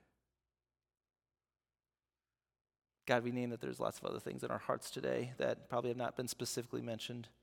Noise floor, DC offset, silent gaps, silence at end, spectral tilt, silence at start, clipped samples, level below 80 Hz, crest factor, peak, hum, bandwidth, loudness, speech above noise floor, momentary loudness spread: under -90 dBFS; under 0.1%; none; 0.15 s; -4.5 dB/octave; 3.05 s; under 0.1%; -78 dBFS; 26 dB; -16 dBFS; none; 17.5 kHz; -40 LUFS; over 50 dB; 7 LU